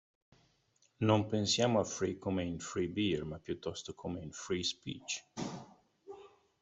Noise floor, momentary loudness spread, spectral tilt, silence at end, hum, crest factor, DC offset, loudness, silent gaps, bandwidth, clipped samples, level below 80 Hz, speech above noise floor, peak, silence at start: -73 dBFS; 13 LU; -4.5 dB/octave; 0.35 s; none; 22 dB; under 0.1%; -36 LUFS; none; 8.2 kHz; under 0.1%; -66 dBFS; 38 dB; -14 dBFS; 1 s